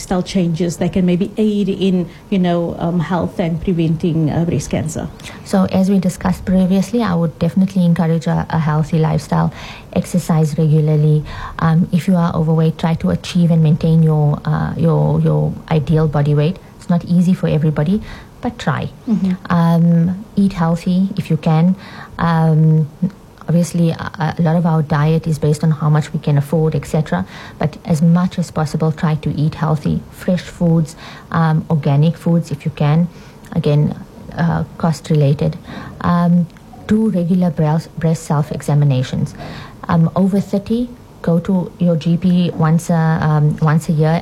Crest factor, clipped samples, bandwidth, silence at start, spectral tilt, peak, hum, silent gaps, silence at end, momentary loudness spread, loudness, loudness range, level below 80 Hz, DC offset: 14 dB; under 0.1%; 12.5 kHz; 0 s; -8 dB/octave; -2 dBFS; none; none; 0 s; 8 LU; -16 LUFS; 3 LU; -40 dBFS; under 0.1%